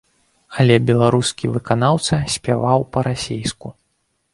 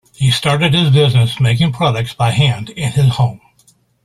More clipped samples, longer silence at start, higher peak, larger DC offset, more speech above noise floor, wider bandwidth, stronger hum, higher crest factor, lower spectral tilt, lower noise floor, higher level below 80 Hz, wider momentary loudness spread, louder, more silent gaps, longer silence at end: neither; first, 0.5 s vs 0.2 s; about the same, 0 dBFS vs -2 dBFS; neither; first, 51 dB vs 41 dB; second, 11.5 kHz vs 13 kHz; neither; first, 18 dB vs 12 dB; about the same, -5.5 dB/octave vs -5.5 dB/octave; first, -68 dBFS vs -54 dBFS; about the same, -46 dBFS vs -44 dBFS; first, 12 LU vs 7 LU; second, -18 LUFS vs -14 LUFS; neither; about the same, 0.65 s vs 0.7 s